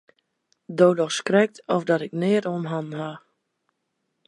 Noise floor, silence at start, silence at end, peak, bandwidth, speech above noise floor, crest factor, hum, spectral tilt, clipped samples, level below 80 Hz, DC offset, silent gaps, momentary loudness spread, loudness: -77 dBFS; 0.7 s; 1.1 s; -4 dBFS; 11.5 kHz; 54 dB; 20 dB; none; -5.5 dB/octave; under 0.1%; -74 dBFS; under 0.1%; none; 13 LU; -23 LUFS